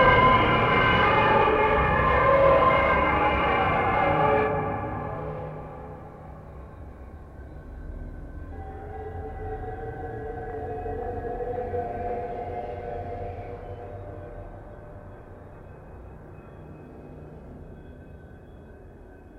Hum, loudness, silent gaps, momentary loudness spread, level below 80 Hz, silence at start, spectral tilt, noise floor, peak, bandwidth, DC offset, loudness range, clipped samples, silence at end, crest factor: none; -24 LUFS; none; 25 LU; -40 dBFS; 0 s; -7.5 dB/octave; -46 dBFS; -6 dBFS; 6.8 kHz; under 0.1%; 24 LU; under 0.1%; 0 s; 20 dB